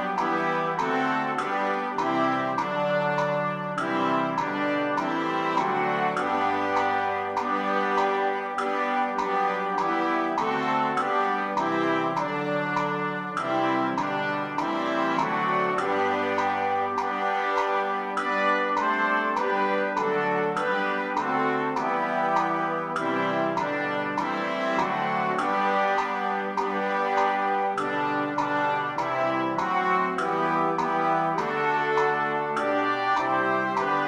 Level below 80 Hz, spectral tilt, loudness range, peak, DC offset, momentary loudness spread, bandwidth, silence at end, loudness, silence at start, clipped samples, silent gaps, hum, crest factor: -66 dBFS; -5.5 dB/octave; 1 LU; -10 dBFS; under 0.1%; 3 LU; 13 kHz; 0 s; -25 LUFS; 0 s; under 0.1%; none; none; 16 dB